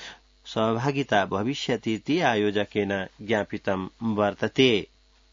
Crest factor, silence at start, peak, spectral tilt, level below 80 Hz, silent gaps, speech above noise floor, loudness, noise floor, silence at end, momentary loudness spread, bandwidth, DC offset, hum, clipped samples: 20 dB; 0 s; -6 dBFS; -5.5 dB/octave; -60 dBFS; none; 20 dB; -25 LUFS; -45 dBFS; 0.45 s; 8 LU; 7.6 kHz; under 0.1%; none; under 0.1%